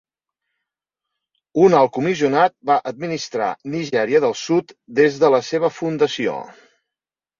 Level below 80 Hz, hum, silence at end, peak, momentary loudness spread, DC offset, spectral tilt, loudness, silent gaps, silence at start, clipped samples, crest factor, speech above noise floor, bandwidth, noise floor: -64 dBFS; none; 0.9 s; 0 dBFS; 11 LU; under 0.1%; -5.5 dB/octave; -19 LUFS; none; 1.55 s; under 0.1%; 20 dB; 71 dB; 7.4 kHz; -89 dBFS